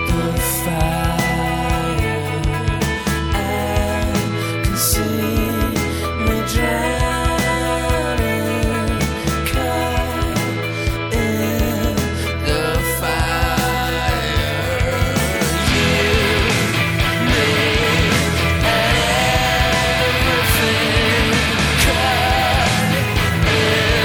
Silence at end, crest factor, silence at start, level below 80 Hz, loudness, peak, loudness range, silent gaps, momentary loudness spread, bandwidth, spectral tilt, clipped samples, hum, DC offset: 0 s; 16 dB; 0 s; -26 dBFS; -17 LUFS; -2 dBFS; 4 LU; none; 5 LU; over 20 kHz; -4.5 dB/octave; under 0.1%; none; under 0.1%